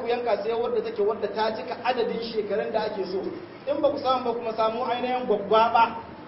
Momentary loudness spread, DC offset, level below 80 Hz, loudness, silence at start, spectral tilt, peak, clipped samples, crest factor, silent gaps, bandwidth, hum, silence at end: 9 LU; under 0.1%; -64 dBFS; -26 LUFS; 0 s; -9 dB/octave; -8 dBFS; under 0.1%; 16 dB; none; 5.8 kHz; none; 0 s